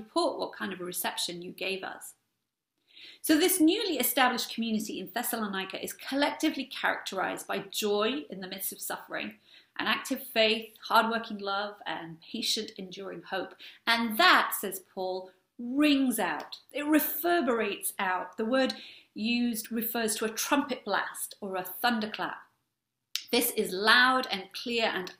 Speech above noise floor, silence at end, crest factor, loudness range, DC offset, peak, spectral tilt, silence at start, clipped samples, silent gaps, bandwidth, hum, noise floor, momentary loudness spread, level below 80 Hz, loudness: 54 dB; 0.05 s; 24 dB; 5 LU; under 0.1%; -6 dBFS; -2.5 dB/octave; 0 s; under 0.1%; none; 16 kHz; none; -84 dBFS; 13 LU; -74 dBFS; -29 LUFS